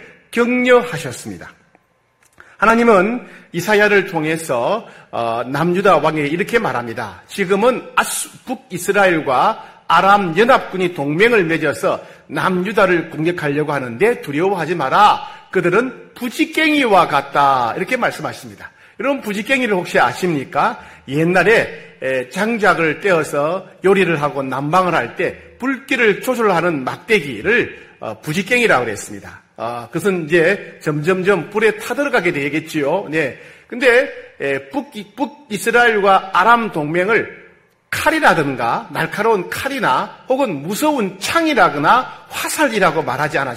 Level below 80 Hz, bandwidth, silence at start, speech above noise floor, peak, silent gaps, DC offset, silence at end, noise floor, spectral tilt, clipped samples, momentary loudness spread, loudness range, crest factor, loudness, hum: -52 dBFS; 16 kHz; 0 s; 42 dB; 0 dBFS; none; under 0.1%; 0 s; -58 dBFS; -4.5 dB/octave; under 0.1%; 13 LU; 3 LU; 16 dB; -16 LUFS; none